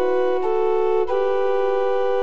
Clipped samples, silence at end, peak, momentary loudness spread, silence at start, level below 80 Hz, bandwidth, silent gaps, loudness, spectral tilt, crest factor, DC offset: under 0.1%; 0 s; -8 dBFS; 1 LU; 0 s; -56 dBFS; 6.8 kHz; none; -21 LUFS; -6 dB/octave; 10 dB; 5%